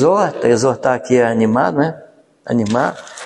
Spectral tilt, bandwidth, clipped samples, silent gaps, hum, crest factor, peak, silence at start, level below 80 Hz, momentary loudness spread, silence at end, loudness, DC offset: -6 dB/octave; 11.5 kHz; under 0.1%; none; none; 14 dB; 0 dBFS; 0 s; -56 dBFS; 7 LU; 0 s; -16 LUFS; under 0.1%